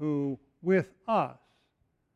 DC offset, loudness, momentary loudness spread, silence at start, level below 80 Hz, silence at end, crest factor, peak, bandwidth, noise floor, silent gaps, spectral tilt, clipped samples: under 0.1%; -30 LUFS; 8 LU; 0 s; -72 dBFS; 0.8 s; 18 dB; -14 dBFS; 8.4 kHz; -75 dBFS; none; -8.5 dB/octave; under 0.1%